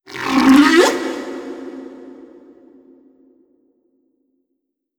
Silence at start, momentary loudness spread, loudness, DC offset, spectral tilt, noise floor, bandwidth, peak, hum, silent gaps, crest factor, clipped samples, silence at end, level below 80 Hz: 0.1 s; 25 LU; -13 LUFS; under 0.1%; -3.5 dB/octave; -74 dBFS; 18.5 kHz; 0 dBFS; none; none; 18 dB; under 0.1%; 2.75 s; -54 dBFS